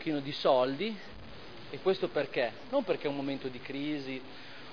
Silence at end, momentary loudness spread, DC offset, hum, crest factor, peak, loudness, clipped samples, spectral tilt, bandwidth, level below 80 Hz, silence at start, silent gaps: 0 s; 19 LU; 0.4%; none; 20 dB; -14 dBFS; -33 LUFS; under 0.1%; -3.5 dB/octave; 5.4 kHz; -64 dBFS; 0 s; none